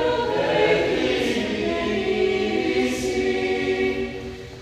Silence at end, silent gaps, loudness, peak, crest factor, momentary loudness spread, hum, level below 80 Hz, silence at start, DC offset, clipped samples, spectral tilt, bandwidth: 0 s; none; -22 LUFS; -6 dBFS; 16 dB; 5 LU; none; -46 dBFS; 0 s; under 0.1%; under 0.1%; -4.5 dB/octave; 14 kHz